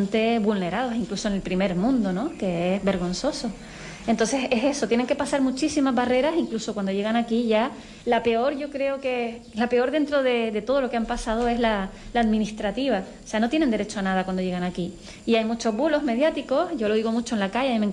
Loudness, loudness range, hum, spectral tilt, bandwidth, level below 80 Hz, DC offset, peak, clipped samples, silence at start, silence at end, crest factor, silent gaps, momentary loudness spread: -24 LUFS; 2 LU; none; -5 dB/octave; 11.5 kHz; -46 dBFS; under 0.1%; -12 dBFS; under 0.1%; 0 s; 0 s; 12 dB; none; 6 LU